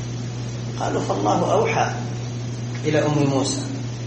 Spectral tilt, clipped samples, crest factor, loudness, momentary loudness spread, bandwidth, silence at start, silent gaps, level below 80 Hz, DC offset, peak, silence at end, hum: -5.5 dB/octave; under 0.1%; 16 dB; -23 LUFS; 10 LU; 8.6 kHz; 0 s; none; -48 dBFS; under 0.1%; -6 dBFS; 0 s; none